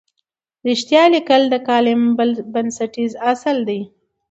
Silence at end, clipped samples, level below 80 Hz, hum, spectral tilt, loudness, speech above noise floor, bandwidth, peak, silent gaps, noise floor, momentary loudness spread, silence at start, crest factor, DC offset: 0.45 s; under 0.1%; -66 dBFS; none; -4 dB/octave; -17 LUFS; 58 dB; 8 kHz; 0 dBFS; none; -74 dBFS; 11 LU; 0.65 s; 16 dB; under 0.1%